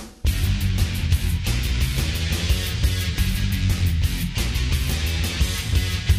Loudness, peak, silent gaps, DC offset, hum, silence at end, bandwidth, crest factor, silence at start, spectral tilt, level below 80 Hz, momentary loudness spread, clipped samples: -23 LUFS; -6 dBFS; none; under 0.1%; none; 0 s; 16 kHz; 16 dB; 0 s; -4.5 dB/octave; -24 dBFS; 2 LU; under 0.1%